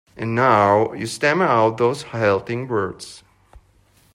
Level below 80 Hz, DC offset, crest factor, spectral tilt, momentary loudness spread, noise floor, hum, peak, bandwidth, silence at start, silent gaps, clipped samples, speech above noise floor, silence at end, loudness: -58 dBFS; under 0.1%; 16 dB; -5.5 dB/octave; 9 LU; -56 dBFS; none; -4 dBFS; 15.5 kHz; 0.15 s; none; under 0.1%; 38 dB; 0.55 s; -19 LUFS